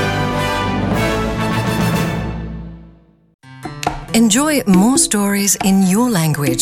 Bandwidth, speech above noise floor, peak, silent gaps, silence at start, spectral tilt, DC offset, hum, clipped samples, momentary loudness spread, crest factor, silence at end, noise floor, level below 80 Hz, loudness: 17 kHz; 32 dB; -2 dBFS; 3.34-3.39 s; 0 s; -4.5 dB/octave; under 0.1%; none; under 0.1%; 14 LU; 14 dB; 0 s; -45 dBFS; -34 dBFS; -15 LUFS